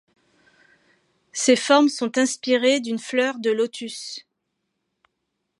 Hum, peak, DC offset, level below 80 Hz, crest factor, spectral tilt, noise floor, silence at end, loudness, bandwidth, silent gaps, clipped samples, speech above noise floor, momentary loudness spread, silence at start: none; -2 dBFS; under 0.1%; -82 dBFS; 20 dB; -2.5 dB/octave; -77 dBFS; 1.4 s; -21 LUFS; 11.5 kHz; none; under 0.1%; 57 dB; 16 LU; 1.35 s